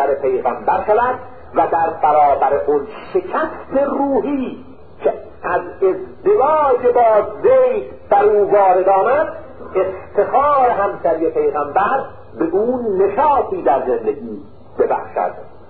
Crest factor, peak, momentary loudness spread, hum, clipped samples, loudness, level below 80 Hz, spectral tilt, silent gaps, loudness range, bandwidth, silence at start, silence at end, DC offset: 14 dB; -2 dBFS; 10 LU; none; under 0.1%; -16 LUFS; -48 dBFS; -11.5 dB/octave; none; 5 LU; 4.5 kHz; 0 s; 0.2 s; 1%